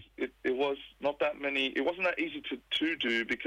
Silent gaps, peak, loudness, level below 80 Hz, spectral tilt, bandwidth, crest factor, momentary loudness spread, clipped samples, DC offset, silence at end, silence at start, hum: none; -20 dBFS; -32 LUFS; -66 dBFS; -4 dB/octave; 13 kHz; 14 dB; 6 LU; under 0.1%; under 0.1%; 0 s; 0 s; none